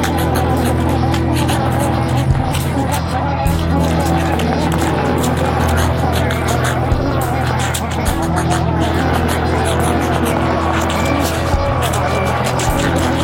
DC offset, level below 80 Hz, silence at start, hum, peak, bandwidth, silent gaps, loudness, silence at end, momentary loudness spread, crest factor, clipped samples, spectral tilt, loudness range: under 0.1%; -24 dBFS; 0 s; none; 0 dBFS; 16.5 kHz; none; -16 LUFS; 0 s; 2 LU; 14 dB; under 0.1%; -5.5 dB/octave; 1 LU